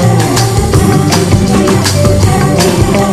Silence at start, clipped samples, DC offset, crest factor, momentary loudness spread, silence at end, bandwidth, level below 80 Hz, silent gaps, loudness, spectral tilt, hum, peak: 0 s; 0.7%; under 0.1%; 8 dB; 1 LU; 0 s; 14.5 kHz; -22 dBFS; none; -9 LUFS; -5.5 dB/octave; none; 0 dBFS